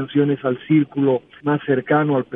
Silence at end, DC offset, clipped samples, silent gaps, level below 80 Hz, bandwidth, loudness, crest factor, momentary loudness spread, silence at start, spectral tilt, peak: 0 s; under 0.1%; under 0.1%; none; -64 dBFS; 3.8 kHz; -19 LUFS; 14 dB; 5 LU; 0 s; -11.5 dB/octave; -4 dBFS